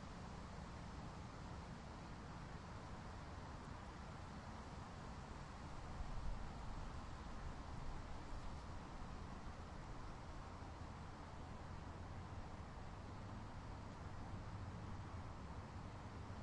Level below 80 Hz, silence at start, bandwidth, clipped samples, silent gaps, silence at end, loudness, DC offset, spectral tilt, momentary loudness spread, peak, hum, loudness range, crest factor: -56 dBFS; 0 s; 11 kHz; under 0.1%; none; 0 s; -54 LUFS; under 0.1%; -6 dB/octave; 2 LU; -34 dBFS; none; 1 LU; 18 dB